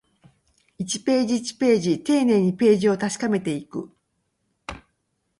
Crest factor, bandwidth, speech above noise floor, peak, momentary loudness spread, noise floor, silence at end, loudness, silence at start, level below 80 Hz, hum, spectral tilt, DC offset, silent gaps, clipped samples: 16 dB; 11.5 kHz; 52 dB; -6 dBFS; 18 LU; -73 dBFS; 0.6 s; -21 LUFS; 0.8 s; -58 dBFS; none; -5.5 dB/octave; under 0.1%; none; under 0.1%